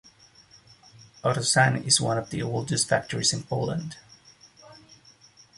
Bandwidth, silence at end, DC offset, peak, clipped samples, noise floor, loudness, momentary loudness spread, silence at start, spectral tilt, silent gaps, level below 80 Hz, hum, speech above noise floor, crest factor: 11.5 kHz; 0.85 s; under 0.1%; -4 dBFS; under 0.1%; -55 dBFS; -24 LUFS; 10 LU; 1.25 s; -3 dB/octave; none; -60 dBFS; none; 30 dB; 24 dB